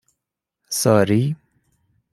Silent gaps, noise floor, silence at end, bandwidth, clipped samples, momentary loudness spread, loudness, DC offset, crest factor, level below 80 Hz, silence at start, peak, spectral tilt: none; -82 dBFS; 0.8 s; 15.5 kHz; under 0.1%; 11 LU; -19 LUFS; under 0.1%; 20 dB; -58 dBFS; 0.7 s; -2 dBFS; -5.5 dB/octave